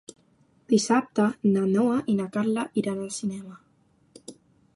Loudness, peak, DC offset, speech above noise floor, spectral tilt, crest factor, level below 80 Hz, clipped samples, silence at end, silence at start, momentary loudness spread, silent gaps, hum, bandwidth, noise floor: -25 LUFS; -10 dBFS; under 0.1%; 39 dB; -5.5 dB/octave; 18 dB; -70 dBFS; under 0.1%; 0.45 s; 0.7 s; 22 LU; none; none; 11.5 kHz; -64 dBFS